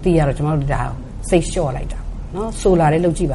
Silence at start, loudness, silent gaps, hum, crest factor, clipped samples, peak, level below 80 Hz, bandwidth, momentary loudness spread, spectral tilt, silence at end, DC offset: 0 s; -18 LUFS; none; none; 16 dB; under 0.1%; -2 dBFS; -26 dBFS; 11.5 kHz; 15 LU; -6.5 dB/octave; 0 s; under 0.1%